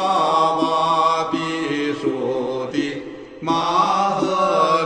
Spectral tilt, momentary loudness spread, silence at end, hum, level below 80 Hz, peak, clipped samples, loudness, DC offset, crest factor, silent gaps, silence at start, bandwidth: -5 dB/octave; 7 LU; 0 s; none; -58 dBFS; -4 dBFS; under 0.1%; -19 LUFS; under 0.1%; 14 dB; none; 0 s; 9.6 kHz